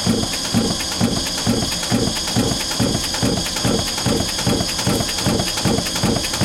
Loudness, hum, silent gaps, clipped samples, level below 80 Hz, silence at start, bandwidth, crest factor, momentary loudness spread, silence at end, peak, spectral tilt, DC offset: -19 LUFS; none; none; under 0.1%; -34 dBFS; 0 s; 17 kHz; 16 dB; 1 LU; 0 s; -4 dBFS; -3.5 dB/octave; under 0.1%